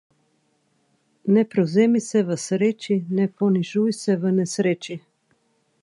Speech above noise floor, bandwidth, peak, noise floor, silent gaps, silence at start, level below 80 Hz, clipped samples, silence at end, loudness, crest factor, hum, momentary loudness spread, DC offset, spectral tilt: 46 dB; 11.5 kHz; -6 dBFS; -67 dBFS; none; 1.25 s; -72 dBFS; under 0.1%; 0.85 s; -22 LUFS; 16 dB; none; 6 LU; under 0.1%; -6.5 dB/octave